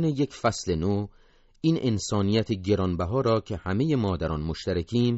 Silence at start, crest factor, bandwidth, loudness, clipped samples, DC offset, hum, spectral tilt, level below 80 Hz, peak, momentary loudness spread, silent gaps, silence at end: 0 s; 16 dB; 8 kHz; -26 LUFS; under 0.1%; under 0.1%; none; -6.5 dB/octave; -46 dBFS; -10 dBFS; 5 LU; none; 0 s